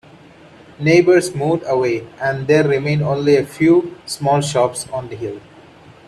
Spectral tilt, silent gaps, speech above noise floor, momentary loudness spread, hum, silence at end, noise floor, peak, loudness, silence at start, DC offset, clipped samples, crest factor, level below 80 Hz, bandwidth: -6 dB/octave; none; 27 dB; 13 LU; none; 0.7 s; -43 dBFS; -2 dBFS; -16 LUFS; 0.8 s; under 0.1%; under 0.1%; 16 dB; -54 dBFS; 13.5 kHz